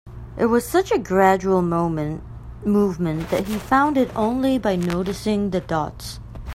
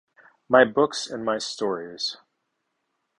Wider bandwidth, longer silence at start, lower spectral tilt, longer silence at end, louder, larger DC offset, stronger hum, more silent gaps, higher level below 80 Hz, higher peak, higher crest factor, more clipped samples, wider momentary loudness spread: first, 16 kHz vs 11 kHz; second, 0.05 s vs 0.5 s; first, -6.5 dB/octave vs -3.5 dB/octave; second, 0 s vs 1.05 s; first, -21 LUFS vs -24 LUFS; neither; neither; neither; first, -40 dBFS vs -68 dBFS; about the same, -2 dBFS vs -2 dBFS; second, 18 dB vs 24 dB; neither; about the same, 12 LU vs 11 LU